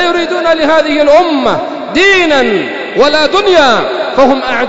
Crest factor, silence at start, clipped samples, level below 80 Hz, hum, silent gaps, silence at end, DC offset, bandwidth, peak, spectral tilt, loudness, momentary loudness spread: 10 dB; 0 s; 0.3%; -40 dBFS; none; none; 0 s; 3%; 8 kHz; 0 dBFS; -3.5 dB/octave; -9 LUFS; 7 LU